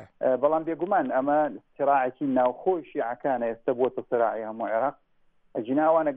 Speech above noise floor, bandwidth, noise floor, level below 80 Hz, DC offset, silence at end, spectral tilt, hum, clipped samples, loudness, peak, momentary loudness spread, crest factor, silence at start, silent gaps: 37 dB; 3.8 kHz; -63 dBFS; -70 dBFS; under 0.1%; 0 s; -10 dB/octave; none; under 0.1%; -26 LUFS; -10 dBFS; 6 LU; 16 dB; 0 s; none